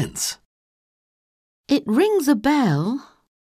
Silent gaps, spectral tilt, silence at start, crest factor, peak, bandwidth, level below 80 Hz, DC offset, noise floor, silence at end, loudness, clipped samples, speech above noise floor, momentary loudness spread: 0.45-1.64 s; -5 dB/octave; 0 s; 16 dB; -6 dBFS; 15.5 kHz; -56 dBFS; under 0.1%; under -90 dBFS; 0.45 s; -20 LUFS; under 0.1%; over 70 dB; 9 LU